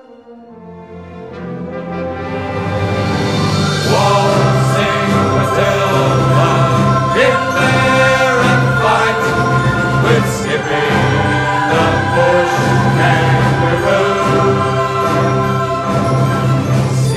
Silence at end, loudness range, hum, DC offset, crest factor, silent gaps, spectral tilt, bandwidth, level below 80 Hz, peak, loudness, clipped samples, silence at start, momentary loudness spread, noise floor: 0 s; 4 LU; none; 0.1%; 12 dB; none; -6 dB/octave; 13.5 kHz; -36 dBFS; -2 dBFS; -13 LUFS; under 0.1%; 0.1 s; 9 LU; -37 dBFS